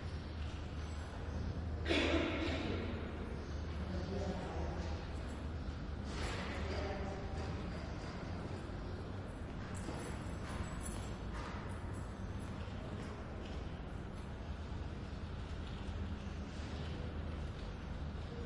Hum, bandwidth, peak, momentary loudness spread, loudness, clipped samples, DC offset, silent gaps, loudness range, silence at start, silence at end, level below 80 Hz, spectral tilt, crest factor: none; 11.5 kHz; -20 dBFS; 7 LU; -43 LUFS; under 0.1%; under 0.1%; none; 7 LU; 0 s; 0 s; -48 dBFS; -6 dB/octave; 22 dB